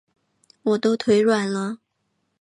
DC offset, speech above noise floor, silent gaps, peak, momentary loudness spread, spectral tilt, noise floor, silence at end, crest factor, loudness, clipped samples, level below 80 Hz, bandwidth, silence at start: under 0.1%; 53 dB; none; -6 dBFS; 12 LU; -5.5 dB/octave; -73 dBFS; 0.65 s; 16 dB; -21 LUFS; under 0.1%; -68 dBFS; 11.5 kHz; 0.65 s